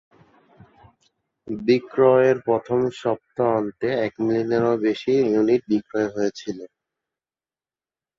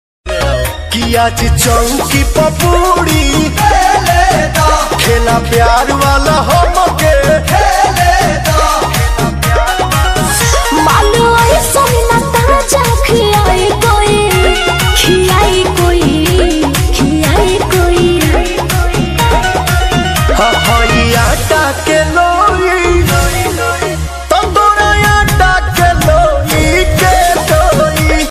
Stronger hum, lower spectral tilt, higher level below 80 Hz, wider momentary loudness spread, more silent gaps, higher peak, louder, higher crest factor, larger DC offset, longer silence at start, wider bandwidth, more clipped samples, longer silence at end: neither; first, -7 dB/octave vs -4 dB/octave; second, -62 dBFS vs -16 dBFS; first, 9 LU vs 4 LU; neither; second, -4 dBFS vs 0 dBFS; second, -21 LUFS vs -9 LUFS; first, 18 dB vs 10 dB; neither; first, 1.45 s vs 0.25 s; second, 7.6 kHz vs 16 kHz; neither; first, 1.55 s vs 0 s